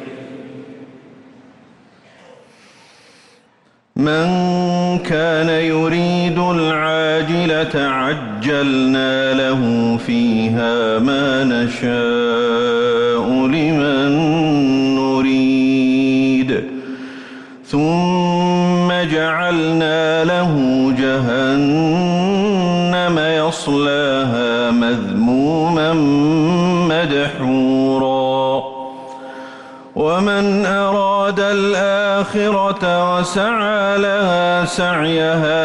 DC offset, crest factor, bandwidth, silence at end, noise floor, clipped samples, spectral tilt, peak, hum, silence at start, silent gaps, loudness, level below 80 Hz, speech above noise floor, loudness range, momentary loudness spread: under 0.1%; 8 dB; 11 kHz; 0 s; -55 dBFS; under 0.1%; -6 dB/octave; -6 dBFS; none; 0 s; none; -16 LUFS; -50 dBFS; 40 dB; 3 LU; 5 LU